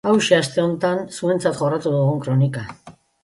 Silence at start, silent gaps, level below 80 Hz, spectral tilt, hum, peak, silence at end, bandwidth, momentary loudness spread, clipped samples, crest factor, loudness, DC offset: 0.05 s; none; -58 dBFS; -6 dB/octave; none; -2 dBFS; 0.35 s; 11.5 kHz; 7 LU; under 0.1%; 18 dB; -20 LUFS; under 0.1%